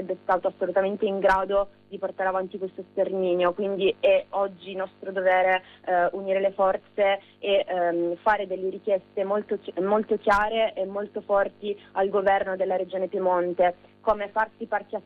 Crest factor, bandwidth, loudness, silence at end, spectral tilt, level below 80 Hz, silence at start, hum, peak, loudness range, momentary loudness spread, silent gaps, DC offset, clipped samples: 14 dB; 6.8 kHz; -25 LUFS; 0.05 s; -6.5 dB/octave; -56 dBFS; 0 s; none; -10 dBFS; 2 LU; 9 LU; none; under 0.1%; under 0.1%